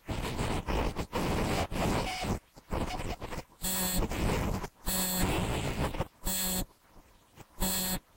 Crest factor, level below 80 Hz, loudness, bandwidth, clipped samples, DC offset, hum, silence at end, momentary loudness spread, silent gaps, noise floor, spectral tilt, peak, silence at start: 16 dB; -40 dBFS; -33 LUFS; 16 kHz; under 0.1%; under 0.1%; none; 0.15 s; 8 LU; none; -58 dBFS; -4 dB/octave; -18 dBFS; 0.05 s